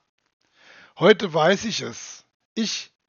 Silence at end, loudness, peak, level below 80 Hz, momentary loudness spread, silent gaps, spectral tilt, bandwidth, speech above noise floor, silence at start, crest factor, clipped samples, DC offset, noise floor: 0.25 s; -21 LUFS; 0 dBFS; -68 dBFS; 18 LU; 2.34-2.56 s; -3 dB/octave; 7.2 kHz; 31 dB; 1 s; 24 dB; under 0.1%; under 0.1%; -52 dBFS